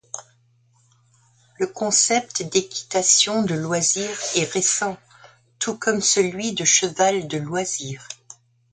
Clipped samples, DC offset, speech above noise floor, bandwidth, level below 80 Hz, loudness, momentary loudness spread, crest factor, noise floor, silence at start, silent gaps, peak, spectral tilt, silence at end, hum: under 0.1%; under 0.1%; 38 dB; 10 kHz; -64 dBFS; -20 LUFS; 13 LU; 20 dB; -60 dBFS; 0.15 s; none; -4 dBFS; -2 dB/octave; 0.4 s; none